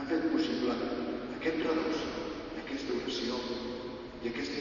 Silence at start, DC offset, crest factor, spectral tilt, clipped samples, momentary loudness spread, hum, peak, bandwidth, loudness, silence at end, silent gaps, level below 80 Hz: 0 s; under 0.1%; 16 dB; -5 dB/octave; under 0.1%; 9 LU; none; -18 dBFS; 7.2 kHz; -34 LUFS; 0 s; none; -58 dBFS